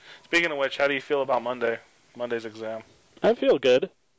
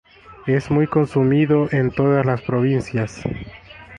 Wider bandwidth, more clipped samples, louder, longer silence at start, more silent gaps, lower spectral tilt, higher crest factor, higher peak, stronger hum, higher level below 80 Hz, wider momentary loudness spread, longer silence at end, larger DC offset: second, 8 kHz vs 9.6 kHz; neither; second, -25 LUFS vs -19 LUFS; second, 0.05 s vs 0.3 s; neither; second, -4.5 dB/octave vs -8.5 dB/octave; about the same, 16 dB vs 14 dB; second, -10 dBFS vs -4 dBFS; neither; second, -66 dBFS vs -46 dBFS; about the same, 14 LU vs 12 LU; first, 0.3 s vs 0 s; neither